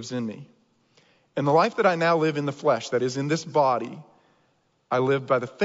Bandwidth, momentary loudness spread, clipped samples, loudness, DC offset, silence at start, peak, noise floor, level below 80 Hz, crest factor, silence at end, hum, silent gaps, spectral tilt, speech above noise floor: 7.8 kHz; 14 LU; under 0.1%; -24 LUFS; under 0.1%; 0 s; -8 dBFS; -67 dBFS; -74 dBFS; 18 dB; 0 s; none; none; -6 dB/octave; 44 dB